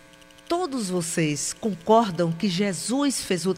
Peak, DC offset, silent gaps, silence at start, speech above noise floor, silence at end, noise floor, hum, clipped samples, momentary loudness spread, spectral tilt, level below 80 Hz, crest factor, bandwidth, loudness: -6 dBFS; under 0.1%; none; 0.5 s; 26 dB; 0 s; -50 dBFS; none; under 0.1%; 7 LU; -4.5 dB/octave; -60 dBFS; 18 dB; 16 kHz; -24 LUFS